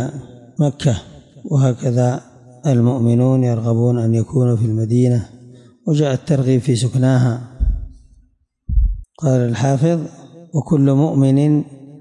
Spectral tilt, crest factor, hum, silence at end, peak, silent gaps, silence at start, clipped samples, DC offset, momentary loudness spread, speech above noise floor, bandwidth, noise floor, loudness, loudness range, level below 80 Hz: -8 dB/octave; 12 dB; none; 0.05 s; -6 dBFS; none; 0 s; under 0.1%; under 0.1%; 11 LU; 40 dB; 10.5 kHz; -55 dBFS; -17 LUFS; 3 LU; -28 dBFS